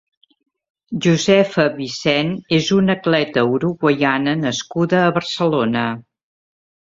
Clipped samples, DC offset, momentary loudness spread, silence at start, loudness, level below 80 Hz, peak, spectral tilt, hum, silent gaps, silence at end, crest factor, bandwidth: under 0.1%; under 0.1%; 7 LU; 0.9 s; -17 LUFS; -56 dBFS; -2 dBFS; -5.5 dB/octave; none; none; 0.85 s; 16 dB; 7.8 kHz